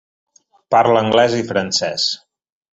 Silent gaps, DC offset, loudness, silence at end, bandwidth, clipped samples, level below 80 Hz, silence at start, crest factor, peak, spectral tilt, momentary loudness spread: none; under 0.1%; -16 LUFS; 0.55 s; 8.2 kHz; under 0.1%; -56 dBFS; 0.7 s; 16 dB; -2 dBFS; -3.5 dB/octave; 6 LU